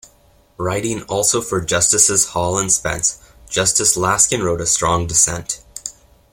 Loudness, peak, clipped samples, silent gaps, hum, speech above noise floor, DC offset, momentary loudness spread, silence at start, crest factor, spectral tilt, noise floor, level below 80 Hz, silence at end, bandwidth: -16 LUFS; 0 dBFS; under 0.1%; none; none; 35 dB; under 0.1%; 13 LU; 0.6 s; 18 dB; -2.5 dB/octave; -52 dBFS; -42 dBFS; 0.4 s; 16.5 kHz